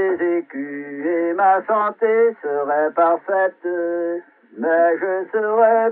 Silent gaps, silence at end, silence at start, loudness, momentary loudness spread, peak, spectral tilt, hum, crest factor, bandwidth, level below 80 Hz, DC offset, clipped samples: none; 0 s; 0 s; -19 LUFS; 10 LU; -4 dBFS; -9.5 dB/octave; none; 16 dB; 3.8 kHz; -82 dBFS; under 0.1%; under 0.1%